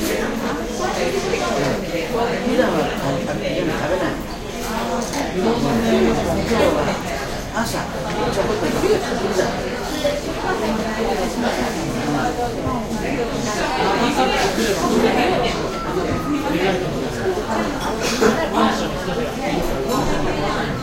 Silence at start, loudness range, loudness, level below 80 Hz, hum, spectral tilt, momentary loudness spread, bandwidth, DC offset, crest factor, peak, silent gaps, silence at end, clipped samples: 0 s; 3 LU; -20 LUFS; -34 dBFS; none; -4.5 dB/octave; 6 LU; 16 kHz; under 0.1%; 18 dB; -2 dBFS; none; 0 s; under 0.1%